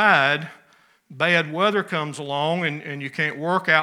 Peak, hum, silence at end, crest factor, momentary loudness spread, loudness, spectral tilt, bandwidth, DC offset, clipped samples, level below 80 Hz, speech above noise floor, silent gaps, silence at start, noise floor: -2 dBFS; none; 0 s; 20 dB; 9 LU; -22 LUFS; -5 dB/octave; 14.5 kHz; under 0.1%; under 0.1%; -80 dBFS; 36 dB; none; 0 s; -58 dBFS